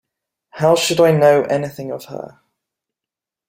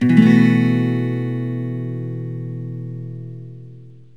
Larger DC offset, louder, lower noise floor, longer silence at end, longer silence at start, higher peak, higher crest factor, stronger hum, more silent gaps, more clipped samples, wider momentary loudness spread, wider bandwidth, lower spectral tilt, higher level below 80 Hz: second, under 0.1% vs 0.5%; first, -15 LUFS vs -19 LUFS; first, -87 dBFS vs -41 dBFS; first, 1.25 s vs 0.25 s; first, 0.55 s vs 0 s; about the same, -2 dBFS vs 0 dBFS; about the same, 16 dB vs 18 dB; neither; neither; neither; about the same, 20 LU vs 22 LU; first, 16 kHz vs 7.4 kHz; second, -5 dB/octave vs -9 dB/octave; first, -60 dBFS vs -66 dBFS